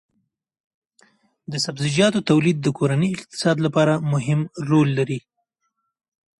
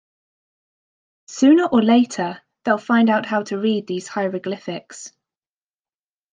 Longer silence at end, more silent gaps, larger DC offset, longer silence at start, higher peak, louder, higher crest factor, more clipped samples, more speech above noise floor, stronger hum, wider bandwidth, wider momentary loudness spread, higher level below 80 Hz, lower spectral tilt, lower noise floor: about the same, 1.2 s vs 1.25 s; neither; neither; first, 1.5 s vs 1.3 s; about the same, -4 dBFS vs -4 dBFS; about the same, -21 LUFS vs -19 LUFS; about the same, 18 dB vs 18 dB; neither; second, 55 dB vs over 72 dB; neither; first, 11.5 kHz vs 9.6 kHz; second, 7 LU vs 17 LU; first, -60 dBFS vs -70 dBFS; about the same, -6 dB/octave vs -5 dB/octave; second, -75 dBFS vs under -90 dBFS